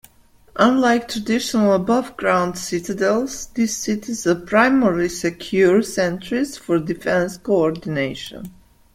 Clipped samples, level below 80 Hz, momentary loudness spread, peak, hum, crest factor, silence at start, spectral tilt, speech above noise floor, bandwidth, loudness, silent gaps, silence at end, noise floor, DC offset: under 0.1%; -50 dBFS; 9 LU; -2 dBFS; none; 18 dB; 0.55 s; -5 dB/octave; 33 dB; 16.5 kHz; -19 LUFS; none; 0.45 s; -52 dBFS; under 0.1%